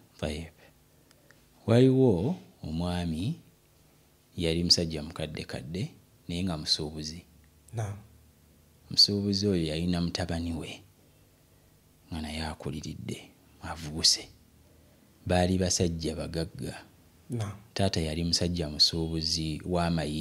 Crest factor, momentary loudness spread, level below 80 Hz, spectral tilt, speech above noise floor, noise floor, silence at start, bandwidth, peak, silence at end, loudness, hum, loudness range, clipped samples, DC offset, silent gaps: 22 dB; 18 LU; -48 dBFS; -4.5 dB/octave; 33 dB; -62 dBFS; 0.2 s; 16 kHz; -8 dBFS; 0 s; -28 LUFS; none; 6 LU; under 0.1%; under 0.1%; none